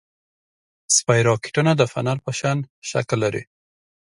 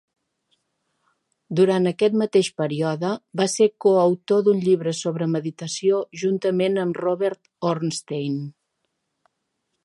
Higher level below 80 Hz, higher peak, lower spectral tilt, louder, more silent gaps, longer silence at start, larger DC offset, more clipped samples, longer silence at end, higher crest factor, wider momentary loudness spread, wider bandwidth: first, -58 dBFS vs -72 dBFS; about the same, -2 dBFS vs -4 dBFS; second, -4 dB/octave vs -5.5 dB/octave; about the same, -20 LUFS vs -22 LUFS; first, 2.70-2.82 s vs none; second, 0.9 s vs 1.5 s; neither; neither; second, 0.7 s vs 1.35 s; about the same, 20 dB vs 18 dB; about the same, 9 LU vs 9 LU; about the same, 11.5 kHz vs 11.5 kHz